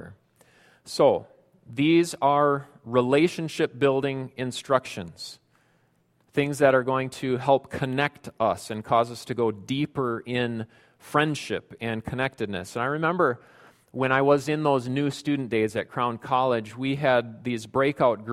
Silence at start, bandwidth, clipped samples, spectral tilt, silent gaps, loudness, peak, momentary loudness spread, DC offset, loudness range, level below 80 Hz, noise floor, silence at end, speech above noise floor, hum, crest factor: 0 s; 15 kHz; under 0.1%; -6 dB/octave; none; -25 LUFS; -6 dBFS; 11 LU; under 0.1%; 4 LU; -62 dBFS; -66 dBFS; 0 s; 41 dB; none; 20 dB